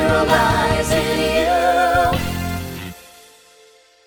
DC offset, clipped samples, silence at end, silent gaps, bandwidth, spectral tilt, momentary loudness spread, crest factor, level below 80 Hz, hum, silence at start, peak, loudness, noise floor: under 0.1%; under 0.1%; 1.05 s; none; 19 kHz; -4.5 dB/octave; 13 LU; 16 dB; -34 dBFS; none; 0 s; -2 dBFS; -17 LUFS; -50 dBFS